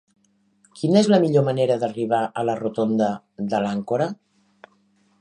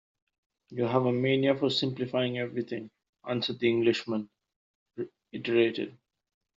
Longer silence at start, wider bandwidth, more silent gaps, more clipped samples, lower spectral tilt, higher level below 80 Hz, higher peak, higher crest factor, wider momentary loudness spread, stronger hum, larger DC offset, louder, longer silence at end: about the same, 0.75 s vs 0.7 s; first, 10 kHz vs 7.6 kHz; second, none vs 3.09-3.13 s, 4.56-4.86 s; neither; first, -7 dB/octave vs -4.5 dB/octave; about the same, -68 dBFS vs -72 dBFS; first, -4 dBFS vs -10 dBFS; about the same, 18 dB vs 20 dB; second, 10 LU vs 15 LU; neither; neither; first, -22 LUFS vs -29 LUFS; first, 1.05 s vs 0.65 s